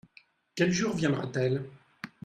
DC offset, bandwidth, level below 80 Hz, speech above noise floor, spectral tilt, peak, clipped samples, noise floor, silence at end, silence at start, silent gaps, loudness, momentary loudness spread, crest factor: under 0.1%; 10.5 kHz; -64 dBFS; 33 dB; -5.5 dB/octave; -12 dBFS; under 0.1%; -61 dBFS; 0.15 s; 0.55 s; none; -29 LUFS; 18 LU; 18 dB